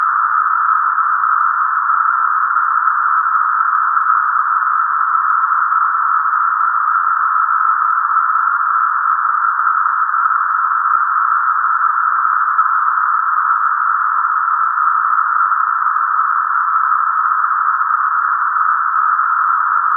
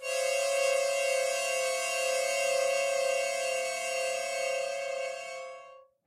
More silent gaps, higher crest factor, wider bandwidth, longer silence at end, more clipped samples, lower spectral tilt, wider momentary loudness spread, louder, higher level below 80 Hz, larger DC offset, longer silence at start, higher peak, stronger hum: neither; about the same, 14 dB vs 14 dB; second, 2 kHz vs 16 kHz; second, 0 s vs 0.25 s; neither; first, 0.5 dB/octave vs 2 dB/octave; second, 1 LU vs 9 LU; first, -14 LUFS vs -30 LUFS; second, under -90 dBFS vs -84 dBFS; neither; about the same, 0 s vs 0 s; first, -2 dBFS vs -16 dBFS; neither